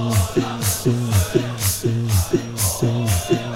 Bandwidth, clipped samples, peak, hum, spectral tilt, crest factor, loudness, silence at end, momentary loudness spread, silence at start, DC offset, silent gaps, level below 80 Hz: 16 kHz; under 0.1%; -4 dBFS; none; -5 dB/octave; 16 dB; -20 LUFS; 0 s; 2 LU; 0 s; under 0.1%; none; -40 dBFS